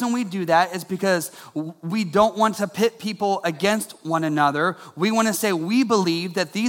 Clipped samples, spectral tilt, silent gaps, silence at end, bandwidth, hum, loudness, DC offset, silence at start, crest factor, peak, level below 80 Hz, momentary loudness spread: under 0.1%; -4.5 dB/octave; none; 0 s; 17.5 kHz; none; -22 LUFS; under 0.1%; 0 s; 18 dB; -4 dBFS; -62 dBFS; 7 LU